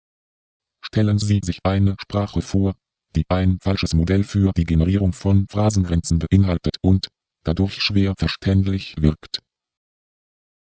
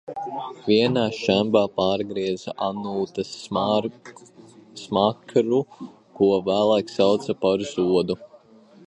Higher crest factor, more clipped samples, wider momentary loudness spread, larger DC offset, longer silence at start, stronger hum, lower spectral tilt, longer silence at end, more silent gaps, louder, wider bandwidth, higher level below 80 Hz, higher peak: about the same, 18 dB vs 20 dB; neither; second, 8 LU vs 12 LU; neither; first, 0.85 s vs 0.1 s; neither; about the same, -6.5 dB/octave vs -6 dB/octave; first, 1.3 s vs 0.6 s; neither; first, -20 LUFS vs -23 LUFS; second, 8 kHz vs 10 kHz; first, -30 dBFS vs -60 dBFS; about the same, -2 dBFS vs -4 dBFS